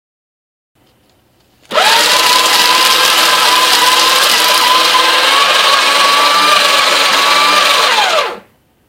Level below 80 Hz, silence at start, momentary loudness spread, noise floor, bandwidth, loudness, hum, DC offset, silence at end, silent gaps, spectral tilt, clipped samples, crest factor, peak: -56 dBFS; 1.7 s; 2 LU; -52 dBFS; over 20 kHz; -7 LUFS; none; under 0.1%; 0.5 s; none; 1 dB/octave; 0.2%; 10 dB; 0 dBFS